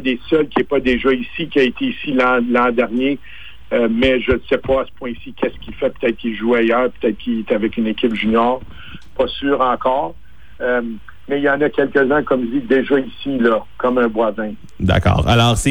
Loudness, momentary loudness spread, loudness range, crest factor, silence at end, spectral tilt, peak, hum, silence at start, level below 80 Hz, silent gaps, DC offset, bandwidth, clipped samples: -17 LUFS; 10 LU; 3 LU; 14 dB; 0 s; -6 dB/octave; -2 dBFS; none; 0 s; -36 dBFS; none; 2%; 18.5 kHz; under 0.1%